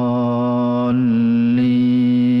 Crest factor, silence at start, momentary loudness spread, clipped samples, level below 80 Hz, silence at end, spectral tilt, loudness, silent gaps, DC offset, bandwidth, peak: 6 dB; 0 s; 3 LU; under 0.1%; -56 dBFS; 0 s; -10 dB/octave; -16 LUFS; none; under 0.1%; 5.4 kHz; -10 dBFS